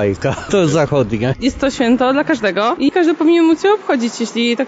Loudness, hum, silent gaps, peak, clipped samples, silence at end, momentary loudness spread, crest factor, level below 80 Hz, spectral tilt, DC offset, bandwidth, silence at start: -15 LUFS; none; none; -4 dBFS; under 0.1%; 0 s; 6 LU; 10 dB; -42 dBFS; -5.5 dB/octave; under 0.1%; 8 kHz; 0 s